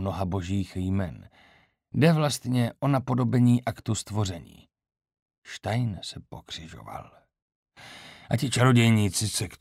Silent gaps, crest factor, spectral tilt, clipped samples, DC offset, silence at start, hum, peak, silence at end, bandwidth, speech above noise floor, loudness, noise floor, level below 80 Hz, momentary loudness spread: 5.22-5.26 s, 5.38-5.42 s, 7.42-7.48 s, 7.55-7.63 s; 18 dB; -5.5 dB/octave; under 0.1%; under 0.1%; 0 s; none; -8 dBFS; 0.05 s; 15 kHz; 35 dB; -25 LUFS; -61 dBFS; -56 dBFS; 20 LU